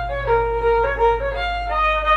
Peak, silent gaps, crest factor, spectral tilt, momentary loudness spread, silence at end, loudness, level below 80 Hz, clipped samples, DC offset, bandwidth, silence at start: -6 dBFS; none; 12 dB; -5.5 dB/octave; 4 LU; 0 s; -19 LUFS; -30 dBFS; under 0.1%; under 0.1%; 7.4 kHz; 0 s